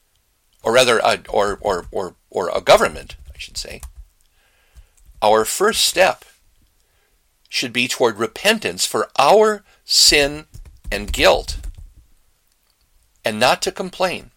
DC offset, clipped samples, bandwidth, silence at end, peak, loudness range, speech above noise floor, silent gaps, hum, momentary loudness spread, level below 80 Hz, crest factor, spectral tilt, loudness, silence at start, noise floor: under 0.1%; under 0.1%; 17 kHz; 0.15 s; -2 dBFS; 6 LU; 45 dB; none; none; 17 LU; -38 dBFS; 18 dB; -2 dB/octave; -17 LUFS; 0.65 s; -63 dBFS